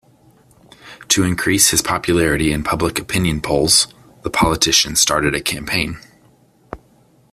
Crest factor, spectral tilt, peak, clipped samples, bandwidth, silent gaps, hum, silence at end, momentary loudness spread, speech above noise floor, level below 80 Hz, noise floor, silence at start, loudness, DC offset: 18 dB; -2.5 dB/octave; 0 dBFS; under 0.1%; 16 kHz; none; none; 0.55 s; 15 LU; 36 dB; -38 dBFS; -53 dBFS; 0.85 s; -16 LUFS; under 0.1%